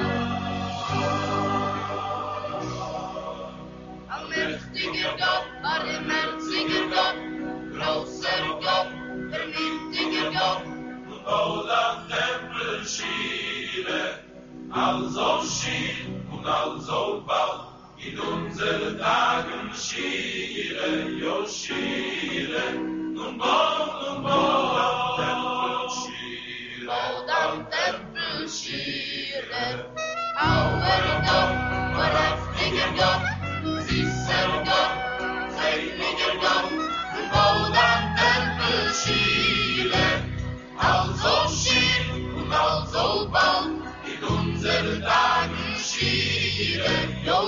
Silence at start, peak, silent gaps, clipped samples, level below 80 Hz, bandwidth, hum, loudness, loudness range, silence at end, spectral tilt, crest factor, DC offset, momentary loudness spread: 0 s; -6 dBFS; none; under 0.1%; -46 dBFS; 7.4 kHz; none; -25 LUFS; 6 LU; 0 s; -2 dB/octave; 18 dB; under 0.1%; 11 LU